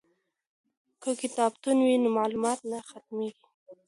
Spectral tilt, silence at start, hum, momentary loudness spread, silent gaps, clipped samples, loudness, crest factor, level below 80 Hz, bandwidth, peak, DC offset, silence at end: -4 dB/octave; 1 s; none; 14 LU; 3.54-3.66 s; under 0.1%; -28 LUFS; 18 dB; -76 dBFS; 11.5 kHz; -12 dBFS; under 0.1%; 0.15 s